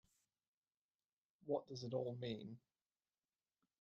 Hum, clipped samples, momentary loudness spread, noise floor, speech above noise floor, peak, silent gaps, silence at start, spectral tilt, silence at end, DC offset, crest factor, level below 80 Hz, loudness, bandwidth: none; under 0.1%; 14 LU; under -90 dBFS; over 44 dB; -28 dBFS; none; 1.45 s; -7 dB/octave; 1.25 s; under 0.1%; 22 dB; -86 dBFS; -46 LUFS; 8.4 kHz